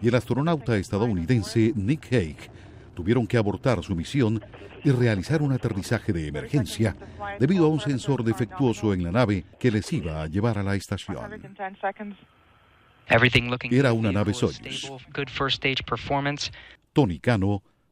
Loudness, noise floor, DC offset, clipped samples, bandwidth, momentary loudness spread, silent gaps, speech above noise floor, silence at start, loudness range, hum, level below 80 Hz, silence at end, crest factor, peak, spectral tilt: -25 LUFS; -58 dBFS; under 0.1%; under 0.1%; 13.5 kHz; 11 LU; none; 33 dB; 0 s; 3 LU; none; -48 dBFS; 0.3 s; 20 dB; -6 dBFS; -6.5 dB/octave